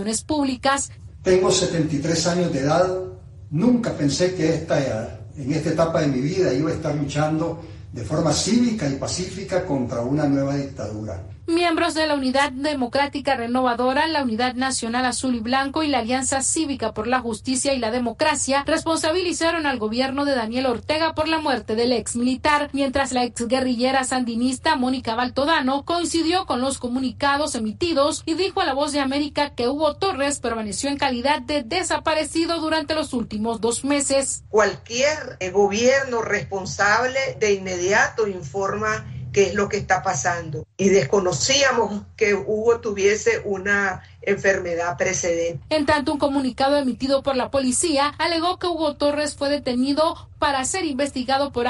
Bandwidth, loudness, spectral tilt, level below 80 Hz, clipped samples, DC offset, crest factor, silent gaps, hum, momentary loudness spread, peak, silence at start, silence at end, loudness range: 11.5 kHz; -21 LUFS; -4 dB/octave; -48 dBFS; under 0.1%; under 0.1%; 16 dB; none; none; 6 LU; -6 dBFS; 0 s; 0 s; 2 LU